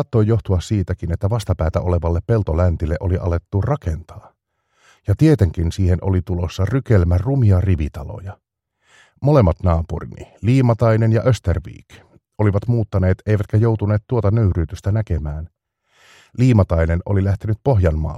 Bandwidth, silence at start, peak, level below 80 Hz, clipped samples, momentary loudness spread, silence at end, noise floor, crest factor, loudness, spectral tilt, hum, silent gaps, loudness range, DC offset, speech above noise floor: 11 kHz; 0 s; -2 dBFS; -30 dBFS; under 0.1%; 11 LU; 0 s; -66 dBFS; 16 dB; -18 LUFS; -8.5 dB/octave; none; none; 2 LU; under 0.1%; 49 dB